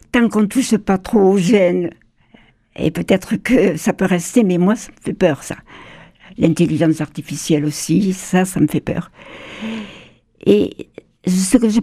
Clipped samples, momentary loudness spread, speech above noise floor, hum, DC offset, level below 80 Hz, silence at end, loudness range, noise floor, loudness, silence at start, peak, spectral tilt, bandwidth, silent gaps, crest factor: under 0.1%; 13 LU; 34 dB; none; under 0.1%; -46 dBFS; 0 s; 3 LU; -50 dBFS; -17 LUFS; 0.15 s; 0 dBFS; -6 dB/octave; 15 kHz; none; 16 dB